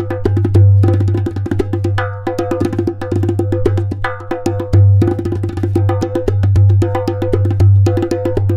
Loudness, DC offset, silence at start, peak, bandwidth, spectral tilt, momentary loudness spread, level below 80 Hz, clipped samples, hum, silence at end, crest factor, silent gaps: -14 LUFS; under 0.1%; 0 s; 0 dBFS; 7.4 kHz; -9 dB/octave; 9 LU; -32 dBFS; under 0.1%; none; 0 s; 12 dB; none